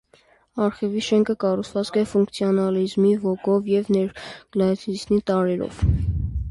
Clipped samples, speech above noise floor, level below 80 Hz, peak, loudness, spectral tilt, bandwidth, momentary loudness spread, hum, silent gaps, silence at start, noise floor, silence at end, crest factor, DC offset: under 0.1%; 36 dB; -34 dBFS; -8 dBFS; -22 LUFS; -7 dB/octave; 11.5 kHz; 6 LU; none; none; 0.55 s; -57 dBFS; 0 s; 14 dB; under 0.1%